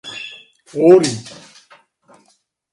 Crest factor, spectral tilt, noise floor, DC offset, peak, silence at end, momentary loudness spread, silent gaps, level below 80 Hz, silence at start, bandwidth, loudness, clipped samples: 18 dB; -5 dB/octave; -61 dBFS; under 0.1%; 0 dBFS; 1.45 s; 22 LU; none; -64 dBFS; 0.05 s; 11 kHz; -13 LUFS; under 0.1%